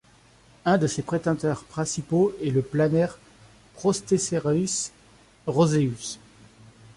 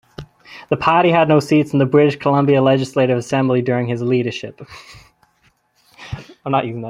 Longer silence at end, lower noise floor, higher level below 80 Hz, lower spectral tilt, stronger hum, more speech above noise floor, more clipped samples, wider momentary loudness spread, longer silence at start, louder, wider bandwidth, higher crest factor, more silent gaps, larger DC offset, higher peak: first, 0.8 s vs 0 s; second, -56 dBFS vs -60 dBFS; second, -58 dBFS vs -52 dBFS; second, -5.5 dB/octave vs -7 dB/octave; neither; second, 32 dB vs 44 dB; neither; second, 8 LU vs 19 LU; first, 0.65 s vs 0.2 s; second, -25 LUFS vs -16 LUFS; about the same, 11.5 kHz vs 12 kHz; about the same, 16 dB vs 16 dB; neither; neither; second, -8 dBFS vs -2 dBFS